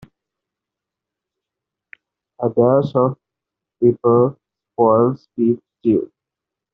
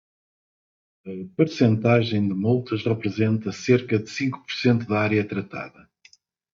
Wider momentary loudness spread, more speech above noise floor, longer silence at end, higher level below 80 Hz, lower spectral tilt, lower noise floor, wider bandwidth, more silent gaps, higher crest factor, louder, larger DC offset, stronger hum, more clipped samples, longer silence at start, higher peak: second, 9 LU vs 14 LU; first, 70 dB vs 35 dB; second, 0.7 s vs 0.85 s; first, -60 dBFS vs -66 dBFS; first, -10 dB/octave vs -7 dB/octave; first, -85 dBFS vs -57 dBFS; second, 5.2 kHz vs 7.4 kHz; neither; about the same, 18 dB vs 18 dB; first, -17 LUFS vs -23 LUFS; neither; neither; neither; first, 2.4 s vs 1.05 s; first, -2 dBFS vs -6 dBFS